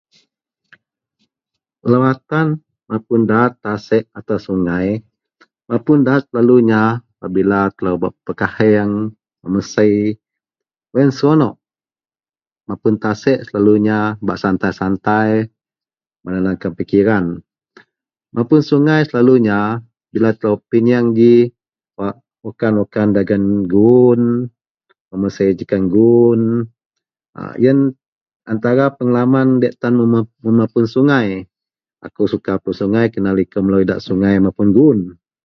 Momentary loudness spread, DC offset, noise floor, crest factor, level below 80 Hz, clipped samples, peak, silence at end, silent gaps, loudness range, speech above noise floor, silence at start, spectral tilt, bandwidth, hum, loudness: 13 LU; under 0.1%; under -90 dBFS; 16 dB; -48 dBFS; under 0.1%; 0 dBFS; 0.35 s; 24.71-24.75 s, 25.00-25.11 s, 26.86-26.90 s, 27.29-27.33 s, 28.08-28.26 s, 28.36-28.40 s; 4 LU; over 76 dB; 1.85 s; -8.5 dB/octave; 6.6 kHz; none; -15 LUFS